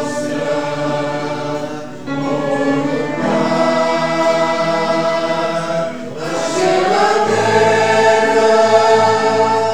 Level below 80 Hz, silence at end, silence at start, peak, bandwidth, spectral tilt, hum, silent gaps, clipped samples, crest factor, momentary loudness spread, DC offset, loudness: -58 dBFS; 0 s; 0 s; 0 dBFS; 13 kHz; -4.5 dB/octave; none; none; under 0.1%; 16 dB; 10 LU; 2%; -15 LUFS